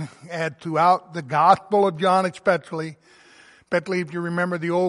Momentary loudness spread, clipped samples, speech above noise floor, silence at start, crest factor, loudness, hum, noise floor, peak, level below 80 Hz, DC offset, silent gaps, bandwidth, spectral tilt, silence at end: 11 LU; under 0.1%; 30 dB; 0 s; 20 dB; -22 LUFS; none; -51 dBFS; -2 dBFS; -68 dBFS; under 0.1%; none; 11.5 kHz; -6 dB/octave; 0 s